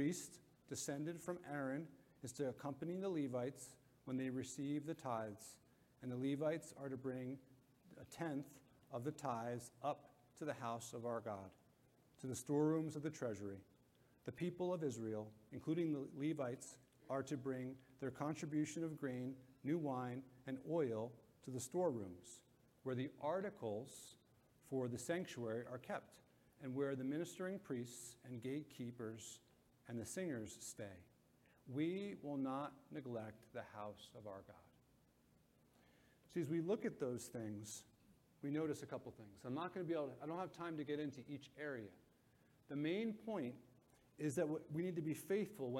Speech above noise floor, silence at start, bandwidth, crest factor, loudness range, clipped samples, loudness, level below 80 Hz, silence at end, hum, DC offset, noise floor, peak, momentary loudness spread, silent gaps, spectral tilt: 29 dB; 0 s; 16.5 kHz; 20 dB; 4 LU; under 0.1%; -46 LUFS; -82 dBFS; 0 s; none; under 0.1%; -75 dBFS; -28 dBFS; 13 LU; none; -6 dB/octave